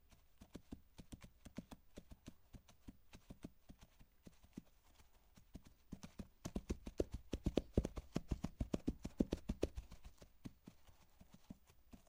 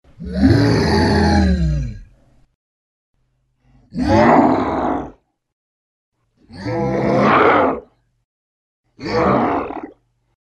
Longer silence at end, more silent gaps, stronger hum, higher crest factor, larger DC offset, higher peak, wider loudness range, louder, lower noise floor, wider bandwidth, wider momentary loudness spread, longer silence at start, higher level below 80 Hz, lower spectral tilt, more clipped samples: second, 0.05 s vs 0.55 s; second, none vs 2.55-3.14 s, 5.53-6.12 s, 8.24-8.84 s; neither; first, 30 dB vs 18 dB; neither; second, -18 dBFS vs 0 dBFS; first, 18 LU vs 2 LU; second, -48 LUFS vs -16 LUFS; first, -68 dBFS vs -64 dBFS; first, 16 kHz vs 12 kHz; first, 23 LU vs 17 LU; about the same, 0.1 s vs 0.2 s; second, -56 dBFS vs -30 dBFS; about the same, -7 dB/octave vs -7 dB/octave; neither